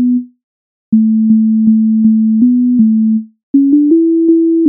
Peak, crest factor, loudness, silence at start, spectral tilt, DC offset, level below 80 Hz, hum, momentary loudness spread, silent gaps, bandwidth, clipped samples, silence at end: 0 dBFS; 8 dB; -10 LUFS; 0 s; -19.5 dB/octave; under 0.1%; -60 dBFS; none; 5 LU; 0.44-0.92 s, 3.43-3.54 s; 0.6 kHz; under 0.1%; 0 s